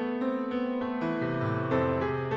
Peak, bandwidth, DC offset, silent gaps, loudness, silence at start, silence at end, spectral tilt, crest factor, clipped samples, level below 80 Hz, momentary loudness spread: -14 dBFS; 6.4 kHz; under 0.1%; none; -30 LUFS; 0 s; 0 s; -9 dB/octave; 16 dB; under 0.1%; -56 dBFS; 3 LU